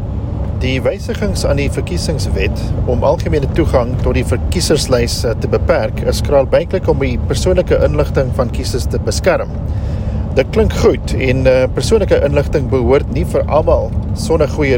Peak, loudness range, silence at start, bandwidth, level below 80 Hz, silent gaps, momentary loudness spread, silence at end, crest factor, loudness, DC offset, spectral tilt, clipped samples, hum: 0 dBFS; 2 LU; 0 s; 16.5 kHz; -22 dBFS; none; 6 LU; 0 s; 14 dB; -15 LUFS; under 0.1%; -6 dB/octave; under 0.1%; none